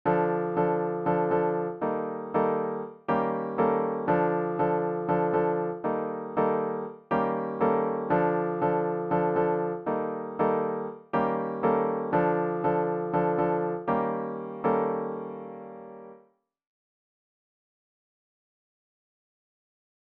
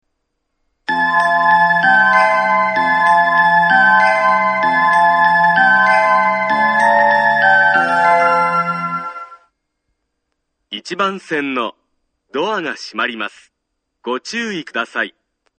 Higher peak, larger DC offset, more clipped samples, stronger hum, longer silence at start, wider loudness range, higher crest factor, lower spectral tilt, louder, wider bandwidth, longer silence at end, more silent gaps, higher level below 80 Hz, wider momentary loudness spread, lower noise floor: second, -12 dBFS vs 0 dBFS; neither; neither; neither; second, 0.05 s vs 0.9 s; second, 5 LU vs 12 LU; about the same, 16 dB vs 14 dB; first, -11 dB/octave vs -4 dB/octave; second, -28 LUFS vs -13 LUFS; second, 4.2 kHz vs 9.2 kHz; first, 3.9 s vs 0.5 s; neither; about the same, -64 dBFS vs -66 dBFS; second, 7 LU vs 14 LU; second, -63 dBFS vs -74 dBFS